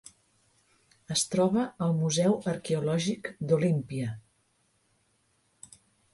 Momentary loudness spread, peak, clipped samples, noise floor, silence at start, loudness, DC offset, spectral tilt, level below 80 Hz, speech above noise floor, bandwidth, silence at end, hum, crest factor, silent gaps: 9 LU; -14 dBFS; under 0.1%; -71 dBFS; 1.1 s; -28 LUFS; under 0.1%; -5.5 dB/octave; -66 dBFS; 43 dB; 11.5 kHz; 1.95 s; none; 16 dB; none